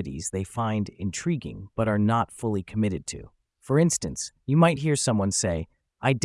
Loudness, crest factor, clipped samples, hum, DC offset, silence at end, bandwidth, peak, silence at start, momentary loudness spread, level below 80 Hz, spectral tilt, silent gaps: -26 LUFS; 18 dB; under 0.1%; none; under 0.1%; 0 s; 12 kHz; -8 dBFS; 0 s; 12 LU; -52 dBFS; -5.5 dB/octave; none